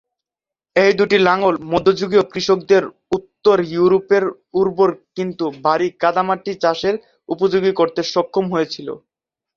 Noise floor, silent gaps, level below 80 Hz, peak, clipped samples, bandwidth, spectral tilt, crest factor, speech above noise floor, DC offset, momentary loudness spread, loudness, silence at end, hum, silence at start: -88 dBFS; none; -56 dBFS; 0 dBFS; under 0.1%; 7.2 kHz; -5.5 dB/octave; 16 dB; 72 dB; under 0.1%; 10 LU; -17 LUFS; 0.6 s; none; 0.75 s